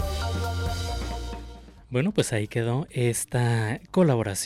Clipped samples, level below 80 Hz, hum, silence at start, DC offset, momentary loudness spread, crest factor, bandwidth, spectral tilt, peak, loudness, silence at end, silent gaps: under 0.1%; -38 dBFS; none; 0 s; under 0.1%; 11 LU; 14 dB; 15.5 kHz; -5.5 dB/octave; -12 dBFS; -26 LUFS; 0 s; none